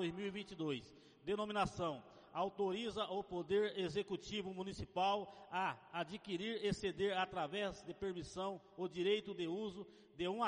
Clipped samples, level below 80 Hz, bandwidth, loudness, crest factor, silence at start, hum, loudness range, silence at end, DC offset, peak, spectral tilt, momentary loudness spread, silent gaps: under 0.1%; -66 dBFS; 10.5 kHz; -42 LUFS; 16 dB; 0 s; none; 2 LU; 0 s; under 0.1%; -26 dBFS; -5 dB/octave; 8 LU; none